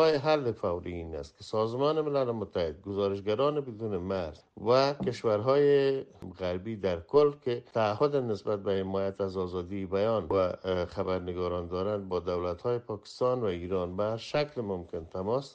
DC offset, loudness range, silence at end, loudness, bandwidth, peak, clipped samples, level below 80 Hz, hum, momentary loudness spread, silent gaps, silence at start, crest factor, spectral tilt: under 0.1%; 4 LU; 0.05 s; -30 LUFS; 8.4 kHz; -12 dBFS; under 0.1%; -58 dBFS; none; 10 LU; none; 0 s; 18 dB; -7 dB/octave